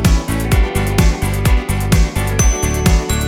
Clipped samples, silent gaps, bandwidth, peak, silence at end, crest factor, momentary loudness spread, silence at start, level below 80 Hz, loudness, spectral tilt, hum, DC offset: under 0.1%; none; 17 kHz; 0 dBFS; 0 s; 14 dB; 2 LU; 0 s; -16 dBFS; -16 LUFS; -5 dB/octave; none; under 0.1%